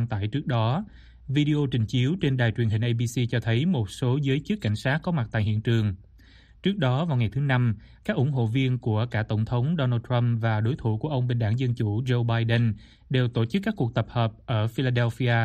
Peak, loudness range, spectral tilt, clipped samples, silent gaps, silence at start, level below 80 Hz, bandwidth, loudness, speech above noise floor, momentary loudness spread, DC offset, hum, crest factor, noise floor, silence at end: -10 dBFS; 1 LU; -7.5 dB/octave; under 0.1%; none; 0 s; -52 dBFS; 9.2 kHz; -26 LUFS; 28 dB; 4 LU; under 0.1%; none; 14 dB; -52 dBFS; 0 s